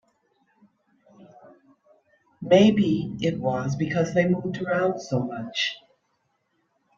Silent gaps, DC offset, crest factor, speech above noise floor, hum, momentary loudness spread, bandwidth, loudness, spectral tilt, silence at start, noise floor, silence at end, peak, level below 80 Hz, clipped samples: none; under 0.1%; 22 dB; 50 dB; none; 10 LU; 7.4 kHz; -23 LUFS; -6.5 dB/octave; 1.2 s; -72 dBFS; 1.2 s; -4 dBFS; -62 dBFS; under 0.1%